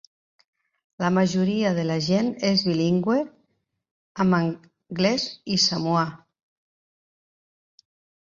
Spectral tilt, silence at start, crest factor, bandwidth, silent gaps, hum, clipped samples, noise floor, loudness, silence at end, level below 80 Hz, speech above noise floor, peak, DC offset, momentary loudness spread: -5.5 dB/octave; 1 s; 18 dB; 7.4 kHz; 3.91-4.15 s; none; under 0.1%; -73 dBFS; -23 LUFS; 2.1 s; -62 dBFS; 50 dB; -8 dBFS; under 0.1%; 8 LU